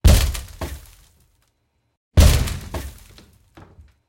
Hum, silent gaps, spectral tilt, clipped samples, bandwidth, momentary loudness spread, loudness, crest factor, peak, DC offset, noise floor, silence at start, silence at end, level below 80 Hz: none; 1.97-2.11 s; -5 dB/octave; under 0.1%; 17 kHz; 19 LU; -20 LUFS; 18 dB; -2 dBFS; under 0.1%; -69 dBFS; 0.05 s; 1.2 s; -24 dBFS